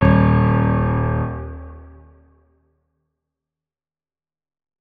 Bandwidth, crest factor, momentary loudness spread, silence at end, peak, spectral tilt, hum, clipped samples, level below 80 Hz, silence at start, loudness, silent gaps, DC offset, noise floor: 4.7 kHz; 20 dB; 21 LU; 2.95 s; -2 dBFS; -11.5 dB/octave; none; under 0.1%; -32 dBFS; 0 s; -18 LUFS; none; under 0.1%; under -90 dBFS